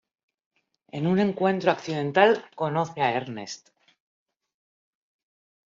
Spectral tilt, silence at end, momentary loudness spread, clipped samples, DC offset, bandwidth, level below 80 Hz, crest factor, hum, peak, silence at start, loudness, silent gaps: -4.5 dB/octave; 2.1 s; 16 LU; under 0.1%; under 0.1%; 7.6 kHz; -70 dBFS; 24 dB; none; -4 dBFS; 0.95 s; -24 LUFS; none